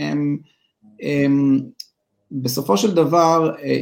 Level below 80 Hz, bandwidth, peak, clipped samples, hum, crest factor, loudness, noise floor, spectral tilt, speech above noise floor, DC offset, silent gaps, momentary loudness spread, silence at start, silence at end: -64 dBFS; 17 kHz; -2 dBFS; under 0.1%; none; 16 dB; -18 LUFS; -56 dBFS; -6 dB/octave; 39 dB; under 0.1%; none; 17 LU; 0 s; 0 s